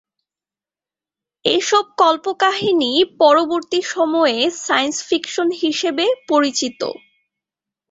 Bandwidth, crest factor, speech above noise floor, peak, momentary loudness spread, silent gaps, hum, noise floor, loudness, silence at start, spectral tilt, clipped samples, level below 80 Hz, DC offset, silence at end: 8 kHz; 16 dB; over 73 dB; -2 dBFS; 7 LU; none; none; under -90 dBFS; -17 LUFS; 1.45 s; -2 dB/octave; under 0.1%; -66 dBFS; under 0.1%; 0.95 s